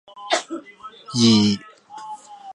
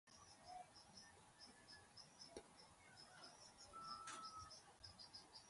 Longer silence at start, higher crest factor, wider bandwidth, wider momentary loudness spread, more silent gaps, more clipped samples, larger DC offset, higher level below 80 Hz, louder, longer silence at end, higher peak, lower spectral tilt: about the same, 0.15 s vs 0.05 s; about the same, 18 dB vs 22 dB; about the same, 11 kHz vs 11.5 kHz; first, 25 LU vs 10 LU; neither; neither; neither; first, -58 dBFS vs -80 dBFS; first, -19 LUFS vs -60 LUFS; about the same, 0 s vs 0 s; first, -4 dBFS vs -38 dBFS; first, -4.5 dB/octave vs -2 dB/octave